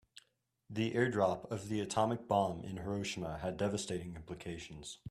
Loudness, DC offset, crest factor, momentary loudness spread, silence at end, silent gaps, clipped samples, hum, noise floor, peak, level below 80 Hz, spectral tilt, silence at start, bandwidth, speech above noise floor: -37 LUFS; under 0.1%; 20 dB; 13 LU; 0 s; none; under 0.1%; none; -77 dBFS; -18 dBFS; -64 dBFS; -5.5 dB/octave; 0.15 s; 14 kHz; 40 dB